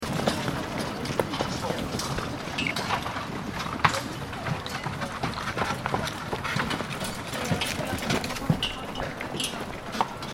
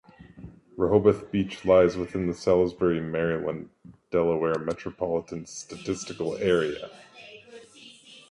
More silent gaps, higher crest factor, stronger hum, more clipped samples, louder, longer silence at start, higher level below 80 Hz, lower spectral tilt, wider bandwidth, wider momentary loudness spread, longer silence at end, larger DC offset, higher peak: neither; first, 28 dB vs 20 dB; neither; neither; second, -29 LUFS vs -26 LUFS; second, 0 s vs 0.2 s; first, -46 dBFS vs -52 dBFS; second, -4 dB/octave vs -6 dB/octave; first, 16.5 kHz vs 11 kHz; second, 5 LU vs 25 LU; second, 0 s vs 0.15 s; neither; first, -2 dBFS vs -6 dBFS